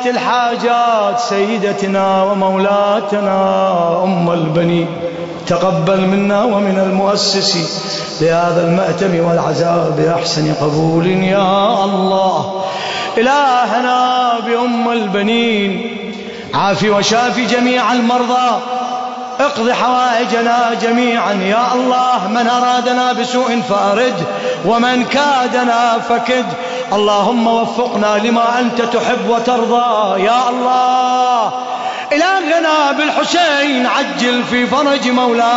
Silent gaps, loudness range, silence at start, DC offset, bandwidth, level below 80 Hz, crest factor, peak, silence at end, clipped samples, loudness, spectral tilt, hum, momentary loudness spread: none; 1 LU; 0 s; under 0.1%; 8 kHz; -54 dBFS; 12 dB; -2 dBFS; 0 s; under 0.1%; -13 LUFS; -5 dB/octave; none; 5 LU